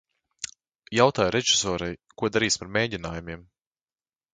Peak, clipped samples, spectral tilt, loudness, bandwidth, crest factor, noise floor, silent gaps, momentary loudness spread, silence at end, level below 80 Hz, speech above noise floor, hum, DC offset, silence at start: -4 dBFS; under 0.1%; -3 dB/octave; -24 LUFS; 10 kHz; 24 dB; under -90 dBFS; none; 17 LU; 0.95 s; -52 dBFS; over 65 dB; none; under 0.1%; 0.4 s